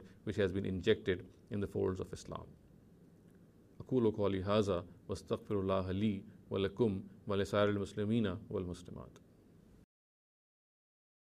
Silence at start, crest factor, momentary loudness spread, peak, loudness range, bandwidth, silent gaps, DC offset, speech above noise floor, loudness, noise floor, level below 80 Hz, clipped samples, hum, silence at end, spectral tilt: 0 s; 20 dB; 14 LU; -18 dBFS; 5 LU; 13 kHz; none; under 0.1%; 27 dB; -37 LUFS; -63 dBFS; -64 dBFS; under 0.1%; none; 2.2 s; -7 dB/octave